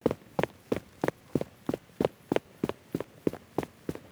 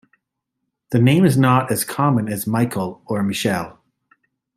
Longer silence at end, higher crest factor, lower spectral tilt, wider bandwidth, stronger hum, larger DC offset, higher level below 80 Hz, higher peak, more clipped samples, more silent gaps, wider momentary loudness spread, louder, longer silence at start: second, 0.1 s vs 0.85 s; first, 24 dB vs 18 dB; about the same, -7 dB/octave vs -6 dB/octave; first, over 20 kHz vs 16 kHz; neither; neither; about the same, -58 dBFS vs -58 dBFS; second, -10 dBFS vs -2 dBFS; neither; neither; second, 6 LU vs 11 LU; second, -35 LUFS vs -18 LUFS; second, 0.05 s vs 0.9 s